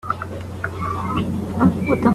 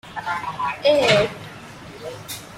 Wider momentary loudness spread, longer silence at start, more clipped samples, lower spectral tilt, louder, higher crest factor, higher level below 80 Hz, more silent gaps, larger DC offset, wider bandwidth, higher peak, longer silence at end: second, 10 LU vs 21 LU; about the same, 0.05 s vs 0.05 s; neither; first, -8 dB/octave vs -4 dB/octave; about the same, -22 LUFS vs -20 LUFS; about the same, 18 dB vs 20 dB; first, -42 dBFS vs -54 dBFS; neither; neither; second, 13.5 kHz vs 16 kHz; about the same, -2 dBFS vs -4 dBFS; about the same, 0 s vs 0 s